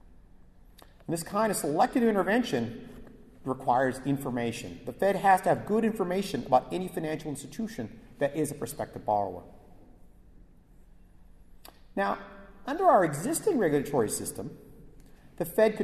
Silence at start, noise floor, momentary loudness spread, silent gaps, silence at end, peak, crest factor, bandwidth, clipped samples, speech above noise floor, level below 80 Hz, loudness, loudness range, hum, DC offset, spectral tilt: 0.1 s; -55 dBFS; 15 LU; none; 0 s; -10 dBFS; 20 dB; 13.5 kHz; under 0.1%; 27 dB; -56 dBFS; -29 LUFS; 9 LU; none; under 0.1%; -5 dB/octave